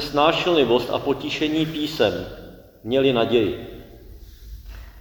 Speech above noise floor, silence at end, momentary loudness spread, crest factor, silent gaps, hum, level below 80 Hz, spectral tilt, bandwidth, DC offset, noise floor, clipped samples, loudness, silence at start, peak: 22 dB; 0 s; 23 LU; 20 dB; none; none; -44 dBFS; -5.5 dB/octave; 19.5 kHz; under 0.1%; -42 dBFS; under 0.1%; -21 LUFS; 0 s; -2 dBFS